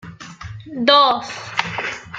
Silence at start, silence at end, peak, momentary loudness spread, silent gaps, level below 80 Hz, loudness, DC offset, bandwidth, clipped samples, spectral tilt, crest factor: 0.05 s; 0 s; 0 dBFS; 23 LU; none; -54 dBFS; -17 LUFS; under 0.1%; 9 kHz; under 0.1%; -3.5 dB/octave; 20 dB